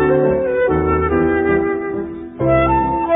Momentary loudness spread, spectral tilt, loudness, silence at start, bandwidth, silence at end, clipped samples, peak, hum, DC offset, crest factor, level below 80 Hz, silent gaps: 8 LU; -13 dB/octave; -16 LUFS; 0 s; 3.8 kHz; 0 s; under 0.1%; -4 dBFS; none; under 0.1%; 12 dB; -30 dBFS; none